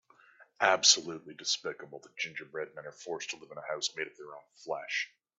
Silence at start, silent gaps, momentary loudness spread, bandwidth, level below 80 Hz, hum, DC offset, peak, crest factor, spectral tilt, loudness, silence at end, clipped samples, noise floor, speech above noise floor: 0.4 s; none; 22 LU; 8.4 kHz; -86 dBFS; none; under 0.1%; -8 dBFS; 26 dB; 0.5 dB/octave; -31 LUFS; 0.3 s; under 0.1%; -61 dBFS; 27 dB